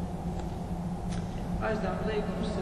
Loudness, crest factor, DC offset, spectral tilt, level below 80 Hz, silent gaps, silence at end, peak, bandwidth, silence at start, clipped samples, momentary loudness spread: -34 LUFS; 12 dB; under 0.1%; -7 dB/octave; -40 dBFS; none; 0 s; -20 dBFS; 12.5 kHz; 0 s; under 0.1%; 5 LU